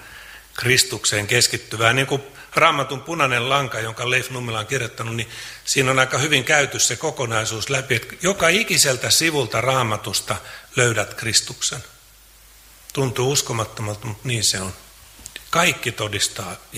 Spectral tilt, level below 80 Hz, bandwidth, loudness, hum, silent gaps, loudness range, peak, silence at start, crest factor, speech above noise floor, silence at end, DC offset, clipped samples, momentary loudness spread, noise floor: -2.5 dB/octave; -52 dBFS; 16 kHz; -19 LUFS; none; none; 5 LU; 0 dBFS; 0 s; 22 dB; 28 dB; 0 s; under 0.1%; under 0.1%; 12 LU; -49 dBFS